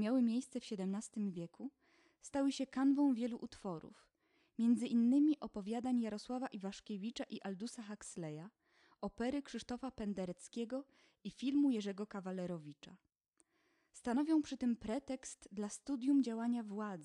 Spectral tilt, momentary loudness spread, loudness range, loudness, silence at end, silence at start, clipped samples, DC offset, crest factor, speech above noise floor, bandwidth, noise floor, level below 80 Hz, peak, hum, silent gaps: -5.5 dB/octave; 15 LU; 8 LU; -39 LUFS; 0 s; 0 s; under 0.1%; under 0.1%; 14 dB; 40 dB; 11 kHz; -79 dBFS; -72 dBFS; -24 dBFS; none; none